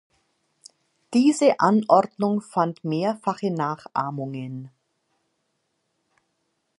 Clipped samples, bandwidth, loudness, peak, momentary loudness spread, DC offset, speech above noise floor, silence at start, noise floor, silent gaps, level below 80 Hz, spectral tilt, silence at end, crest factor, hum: under 0.1%; 11.5 kHz; -23 LUFS; -4 dBFS; 14 LU; under 0.1%; 52 dB; 1.1 s; -74 dBFS; none; -76 dBFS; -6.5 dB/octave; 2.1 s; 22 dB; none